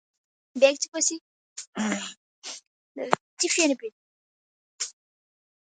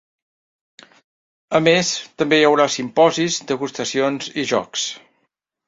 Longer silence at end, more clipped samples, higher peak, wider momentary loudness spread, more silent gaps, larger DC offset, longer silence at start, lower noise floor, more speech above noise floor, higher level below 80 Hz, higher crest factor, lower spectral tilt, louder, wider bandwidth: about the same, 0.7 s vs 0.7 s; neither; about the same, 0 dBFS vs -2 dBFS; first, 20 LU vs 9 LU; first, 0.88-0.92 s, 1.21-1.56 s, 1.67-1.73 s, 2.17-2.42 s, 2.67-2.95 s, 3.21-3.37 s, 3.92-4.78 s vs none; neither; second, 0.55 s vs 1.5 s; first, under -90 dBFS vs -71 dBFS; first, over 65 dB vs 53 dB; second, -78 dBFS vs -62 dBFS; first, 28 dB vs 18 dB; second, -2 dB/octave vs -3.5 dB/octave; second, -26 LUFS vs -18 LUFS; first, 9.6 kHz vs 7.8 kHz